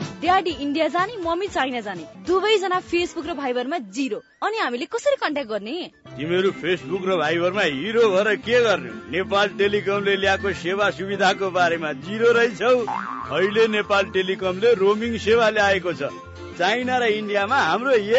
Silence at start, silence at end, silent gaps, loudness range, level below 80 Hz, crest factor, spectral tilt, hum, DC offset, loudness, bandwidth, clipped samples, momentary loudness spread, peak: 0 s; 0 s; none; 4 LU; -56 dBFS; 16 dB; -4.5 dB/octave; none; under 0.1%; -21 LUFS; 8 kHz; under 0.1%; 9 LU; -6 dBFS